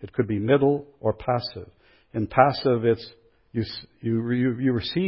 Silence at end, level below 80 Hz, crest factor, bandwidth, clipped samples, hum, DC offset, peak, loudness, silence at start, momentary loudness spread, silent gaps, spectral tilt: 0 s; -52 dBFS; 22 dB; 5.8 kHz; under 0.1%; none; under 0.1%; -2 dBFS; -24 LUFS; 0 s; 13 LU; none; -11.5 dB/octave